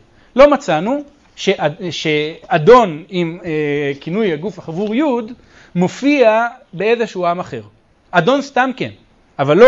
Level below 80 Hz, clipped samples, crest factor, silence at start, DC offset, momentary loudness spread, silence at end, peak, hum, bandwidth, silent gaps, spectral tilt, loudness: -46 dBFS; under 0.1%; 16 dB; 0.35 s; under 0.1%; 13 LU; 0 s; 0 dBFS; none; 7.8 kHz; none; -6 dB/octave; -16 LUFS